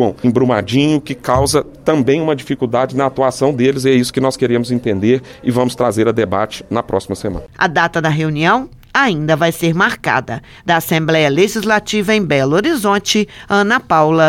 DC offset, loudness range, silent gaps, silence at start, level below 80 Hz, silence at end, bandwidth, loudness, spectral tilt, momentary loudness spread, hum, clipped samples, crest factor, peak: under 0.1%; 2 LU; none; 0 s; -42 dBFS; 0 s; 17 kHz; -15 LUFS; -5 dB/octave; 5 LU; none; under 0.1%; 14 dB; 0 dBFS